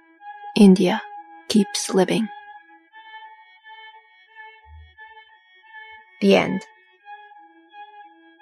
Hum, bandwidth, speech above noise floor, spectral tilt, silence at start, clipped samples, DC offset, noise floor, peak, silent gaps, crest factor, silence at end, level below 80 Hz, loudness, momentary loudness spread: none; 13 kHz; 35 dB; -5.5 dB/octave; 0.25 s; under 0.1%; under 0.1%; -52 dBFS; -2 dBFS; none; 20 dB; 0.55 s; -60 dBFS; -19 LUFS; 28 LU